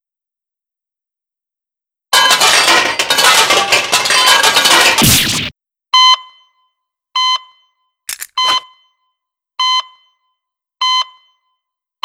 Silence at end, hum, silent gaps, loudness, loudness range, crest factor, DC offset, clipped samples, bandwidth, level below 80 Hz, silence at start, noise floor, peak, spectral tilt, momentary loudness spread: 1 s; none; none; -10 LUFS; 11 LU; 14 dB; under 0.1%; 0.1%; over 20 kHz; -42 dBFS; 2.1 s; -87 dBFS; 0 dBFS; -0.5 dB/octave; 13 LU